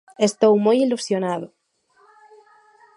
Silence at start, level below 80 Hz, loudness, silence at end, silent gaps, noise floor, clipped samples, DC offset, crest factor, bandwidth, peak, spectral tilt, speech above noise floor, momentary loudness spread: 0.2 s; -74 dBFS; -19 LUFS; 1.5 s; none; -60 dBFS; under 0.1%; under 0.1%; 18 dB; 11.5 kHz; -4 dBFS; -5 dB/octave; 41 dB; 12 LU